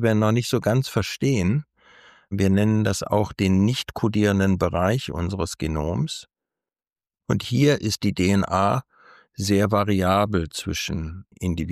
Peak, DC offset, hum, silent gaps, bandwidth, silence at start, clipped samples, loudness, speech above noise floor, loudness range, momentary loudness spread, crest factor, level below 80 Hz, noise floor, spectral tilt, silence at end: -8 dBFS; under 0.1%; none; none; 15 kHz; 0 s; under 0.1%; -22 LUFS; over 68 dB; 4 LU; 8 LU; 14 dB; -44 dBFS; under -90 dBFS; -6 dB/octave; 0 s